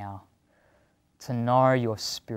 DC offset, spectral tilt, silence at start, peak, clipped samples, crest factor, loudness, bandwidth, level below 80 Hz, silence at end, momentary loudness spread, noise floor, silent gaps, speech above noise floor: under 0.1%; -5.5 dB/octave; 0 s; -10 dBFS; under 0.1%; 18 dB; -25 LUFS; 16 kHz; -66 dBFS; 0 s; 23 LU; -66 dBFS; none; 41 dB